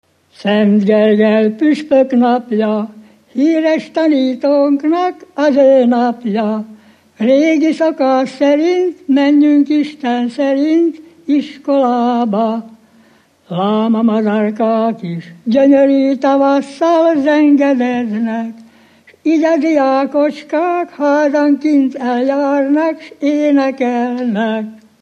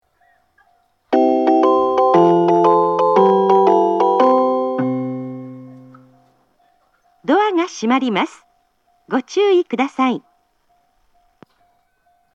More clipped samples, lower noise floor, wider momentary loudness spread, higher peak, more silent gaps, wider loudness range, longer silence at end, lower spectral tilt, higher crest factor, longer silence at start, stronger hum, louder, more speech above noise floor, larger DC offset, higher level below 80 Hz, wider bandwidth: neither; second, -49 dBFS vs -62 dBFS; second, 8 LU vs 13 LU; about the same, 0 dBFS vs 0 dBFS; neither; second, 3 LU vs 8 LU; second, 0.25 s vs 2.15 s; about the same, -7 dB/octave vs -6.5 dB/octave; about the same, 12 dB vs 16 dB; second, 0.4 s vs 1.1 s; neither; about the same, -13 LUFS vs -15 LUFS; second, 37 dB vs 44 dB; neither; about the same, -66 dBFS vs -68 dBFS; first, 8.6 kHz vs 7.8 kHz